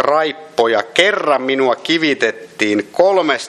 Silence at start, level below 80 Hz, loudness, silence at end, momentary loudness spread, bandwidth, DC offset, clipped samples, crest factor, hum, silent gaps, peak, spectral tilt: 0 s; -64 dBFS; -15 LUFS; 0 s; 5 LU; 12.5 kHz; under 0.1%; under 0.1%; 16 dB; none; none; 0 dBFS; -3.5 dB/octave